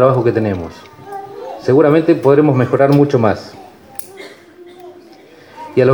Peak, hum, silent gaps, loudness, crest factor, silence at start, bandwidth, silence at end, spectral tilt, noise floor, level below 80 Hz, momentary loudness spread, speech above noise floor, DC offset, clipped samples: 0 dBFS; none; none; -13 LUFS; 14 dB; 0 s; 19.5 kHz; 0 s; -8.5 dB/octave; -41 dBFS; -52 dBFS; 22 LU; 29 dB; under 0.1%; under 0.1%